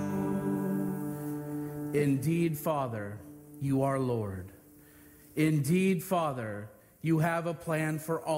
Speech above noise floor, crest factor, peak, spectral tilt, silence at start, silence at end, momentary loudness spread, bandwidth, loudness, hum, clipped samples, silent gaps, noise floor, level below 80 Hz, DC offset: 26 dB; 16 dB; -16 dBFS; -7 dB/octave; 0 s; 0 s; 12 LU; 16 kHz; -31 LUFS; none; under 0.1%; none; -56 dBFS; -64 dBFS; under 0.1%